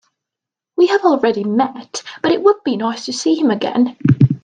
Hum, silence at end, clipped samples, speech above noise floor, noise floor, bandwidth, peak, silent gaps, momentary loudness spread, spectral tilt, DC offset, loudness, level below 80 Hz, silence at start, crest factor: none; 0.05 s; under 0.1%; 70 dB; -85 dBFS; 9.6 kHz; 0 dBFS; none; 8 LU; -6.5 dB/octave; under 0.1%; -16 LUFS; -54 dBFS; 0.8 s; 16 dB